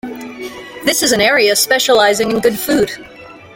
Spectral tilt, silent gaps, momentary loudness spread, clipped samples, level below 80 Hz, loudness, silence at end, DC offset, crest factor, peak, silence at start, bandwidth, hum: -2 dB/octave; none; 17 LU; under 0.1%; -48 dBFS; -12 LUFS; 0.1 s; under 0.1%; 14 dB; 0 dBFS; 0.05 s; 17 kHz; none